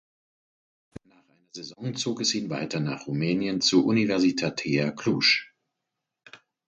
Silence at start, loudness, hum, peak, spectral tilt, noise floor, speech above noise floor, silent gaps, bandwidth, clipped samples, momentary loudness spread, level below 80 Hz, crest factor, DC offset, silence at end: 1.55 s; -25 LUFS; none; -8 dBFS; -4 dB/octave; -84 dBFS; 59 dB; none; 8.8 kHz; under 0.1%; 13 LU; -66 dBFS; 20 dB; under 0.1%; 0.3 s